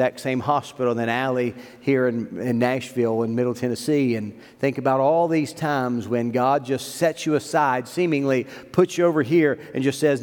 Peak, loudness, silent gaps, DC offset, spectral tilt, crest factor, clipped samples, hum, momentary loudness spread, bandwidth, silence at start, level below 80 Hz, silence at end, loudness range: -4 dBFS; -22 LUFS; none; under 0.1%; -6 dB/octave; 18 dB; under 0.1%; none; 7 LU; 18.5 kHz; 0 s; -68 dBFS; 0 s; 2 LU